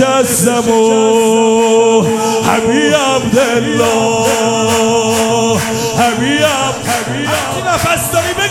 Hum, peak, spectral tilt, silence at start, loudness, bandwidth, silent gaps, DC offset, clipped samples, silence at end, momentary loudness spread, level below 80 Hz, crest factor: none; 0 dBFS; -3.5 dB/octave; 0 s; -11 LUFS; 17 kHz; none; under 0.1%; under 0.1%; 0 s; 5 LU; -44 dBFS; 12 dB